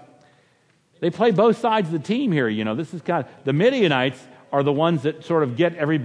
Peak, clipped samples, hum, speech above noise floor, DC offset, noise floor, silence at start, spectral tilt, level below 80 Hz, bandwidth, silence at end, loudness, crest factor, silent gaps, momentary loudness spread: -4 dBFS; under 0.1%; none; 41 dB; under 0.1%; -61 dBFS; 1 s; -7 dB/octave; -72 dBFS; 10.5 kHz; 0 s; -21 LUFS; 16 dB; none; 8 LU